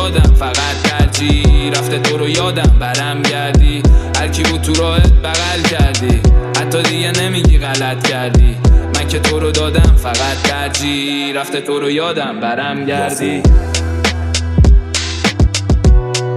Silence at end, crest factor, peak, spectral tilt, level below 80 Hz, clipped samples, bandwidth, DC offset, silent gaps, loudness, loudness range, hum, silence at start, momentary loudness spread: 0 s; 12 dB; 0 dBFS; -4.5 dB/octave; -14 dBFS; under 0.1%; 13.5 kHz; under 0.1%; none; -13 LUFS; 3 LU; none; 0 s; 6 LU